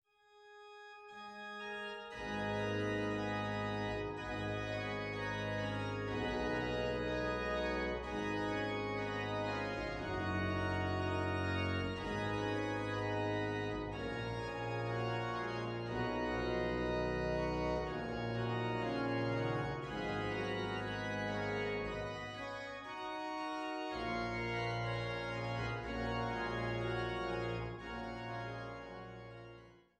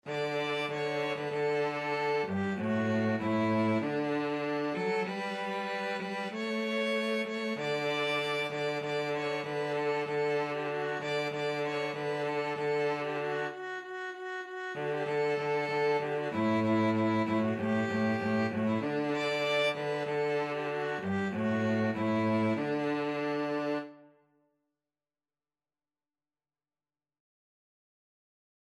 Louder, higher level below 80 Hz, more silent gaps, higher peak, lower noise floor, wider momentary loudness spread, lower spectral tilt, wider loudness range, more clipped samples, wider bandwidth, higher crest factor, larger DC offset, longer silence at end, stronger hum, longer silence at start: second, -39 LUFS vs -32 LUFS; first, -54 dBFS vs -76 dBFS; neither; second, -24 dBFS vs -18 dBFS; second, -64 dBFS vs under -90 dBFS; about the same, 7 LU vs 5 LU; about the same, -6.5 dB/octave vs -6 dB/octave; about the same, 3 LU vs 4 LU; neither; second, 10.5 kHz vs 12.5 kHz; about the same, 16 dB vs 14 dB; neither; second, 0.2 s vs 4.6 s; neither; first, 0.35 s vs 0.05 s